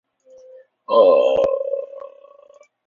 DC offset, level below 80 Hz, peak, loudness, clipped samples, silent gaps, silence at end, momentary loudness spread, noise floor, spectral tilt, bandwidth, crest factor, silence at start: under 0.1%; -60 dBFS; -2 dBFS; -17 LUFS; under 0.1%; none; 0.8 s; 20 LU; -50 dBFS; -5.5 dB/octave; 7 kHz; 18 dB; 0.9 s